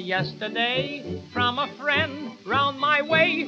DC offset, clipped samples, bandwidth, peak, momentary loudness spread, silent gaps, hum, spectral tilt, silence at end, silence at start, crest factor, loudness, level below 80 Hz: under 0.1%; under 0.1%; 7.8 kHz; -8 dBFS; 11 LU; none; none; -5.5 dB/octave; 0 s; 0 s; 18 dB; -24 LUFS; -62 dBFS